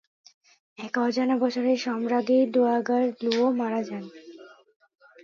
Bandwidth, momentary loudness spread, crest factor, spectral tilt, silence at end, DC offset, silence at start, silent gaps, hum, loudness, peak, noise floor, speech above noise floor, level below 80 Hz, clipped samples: 7.2 kHz; 14 LU; 16 dB; -5 dB/octave; 0.75 s; under 0.1%; 0.8 s; none; none; -25 LUFS; -10 dBFS; -48 dBFS; 24 dB; -80 dBFS; under 0.1%